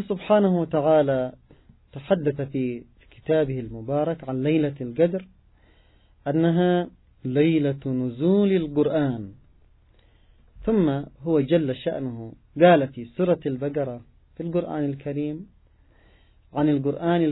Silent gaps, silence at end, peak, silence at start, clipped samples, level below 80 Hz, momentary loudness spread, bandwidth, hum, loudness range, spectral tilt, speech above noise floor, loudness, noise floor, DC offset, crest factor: none; 0 s; -4 dBFS; 0 s; under 0.1%; -54 dBFS; 14 LU; 4.1 kHz; none; 5 LU; -12 dB/octave; 34 dB; -24 LUFS; -57 dBFS; under 0.1%; 20 dB